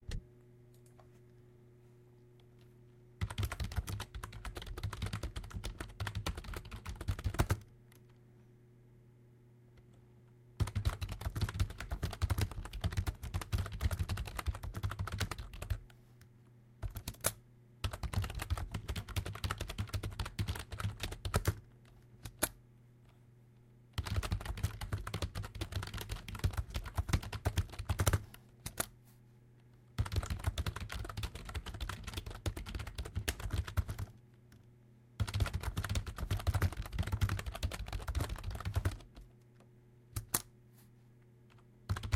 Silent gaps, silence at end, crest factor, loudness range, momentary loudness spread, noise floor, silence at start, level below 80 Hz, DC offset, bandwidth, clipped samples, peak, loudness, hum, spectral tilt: none; 0 s; 30 dB; 5 LU; 21 LU; -62 dBFS; 0 s; -44 dBFS; under 0.1%; 16.5 kHz; under 0.1%; -10 dBFS; -40 LUFS; none; -4.5 dB/octave